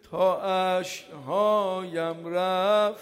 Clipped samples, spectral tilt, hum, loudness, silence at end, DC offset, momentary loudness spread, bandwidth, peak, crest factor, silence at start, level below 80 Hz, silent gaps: under 0.1%; -4.5 dB/octave; none; -26 LUFS; 0 s; under 0.1%; 8 LU; 16 kHz; -12 dBFS; 14 dB; 0.1 s; -72 dBFS; none